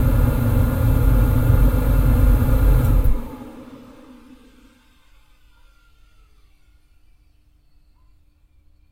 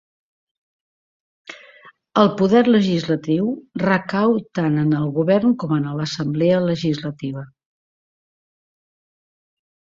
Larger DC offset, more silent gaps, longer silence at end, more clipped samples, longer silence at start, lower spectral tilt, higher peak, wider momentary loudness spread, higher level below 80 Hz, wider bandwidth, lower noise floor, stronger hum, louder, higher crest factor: neither; neither; first, 5.15 s vs 2.45 s; neither; second, 0 s vs 1.5 s; about the same, -8 dB/octave vs -7.5 dB/octave; about the same, -4 dBFS vs -2 dBFS; first, 19 LU vs 13 LU; first, -22 dBFS vs -60 dBFS; first, 16 kHz vs 7.6 kHz; first, -55 dBFS vs -48 dBFS; neither; about the same, -19 LUFS vs -19 LUFS; about the same, 16 dB vs 18 dB